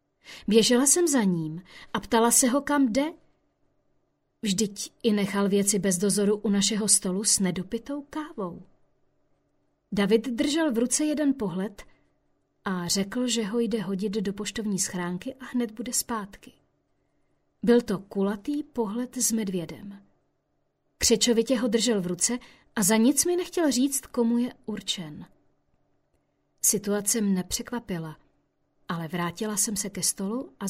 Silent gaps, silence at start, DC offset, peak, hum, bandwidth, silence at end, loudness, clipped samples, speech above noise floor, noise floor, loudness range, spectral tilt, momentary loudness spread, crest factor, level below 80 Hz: none; 0.25 s; under 0.1%; -6 dBFS; none; 16 kHz; 0 s; -25 LUFS; under 0.1%; 48 dB; -74 dBFS; 6 LU; -3.5 dB/octave; 14 LU; 20 dB; -58 dBFS